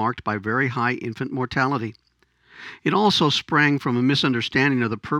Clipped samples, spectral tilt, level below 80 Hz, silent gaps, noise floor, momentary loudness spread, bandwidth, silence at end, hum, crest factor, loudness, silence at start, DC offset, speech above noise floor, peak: under 0.1%; -5.5 dB/octave; -56 dBFS; none; -61 dBFS; 10 LU; 12.5 kHz; 0 s; none; 18 dB; -21 LUFS; 0 s; under 0.1%; 39 dB; -4 dBFS